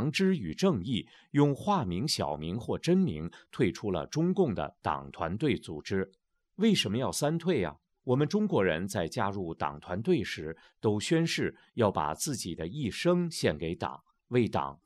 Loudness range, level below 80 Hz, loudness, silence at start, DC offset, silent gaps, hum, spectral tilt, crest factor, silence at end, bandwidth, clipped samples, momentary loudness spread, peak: 2 LU; -60 dBFS; -31 LUFS; 0 s; under 0.1%; none; none; -5.5 dB/octave; 20 dB; 0.1 s; 14 kHz; under 0.1%; 8 LU; -10 dBFS